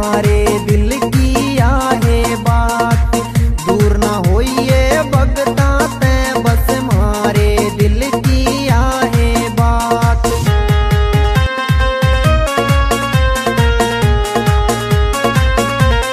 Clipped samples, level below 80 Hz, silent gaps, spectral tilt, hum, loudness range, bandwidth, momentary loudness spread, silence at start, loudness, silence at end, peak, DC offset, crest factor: under 0.1%; -16 dBFS; none; -5.5 dB/octave; none; 0 LU; 15.5 kHz; 2 LU; 0 s; -13 LUFS; 0 s; 0 dBFS; under 0.1%; 12 dB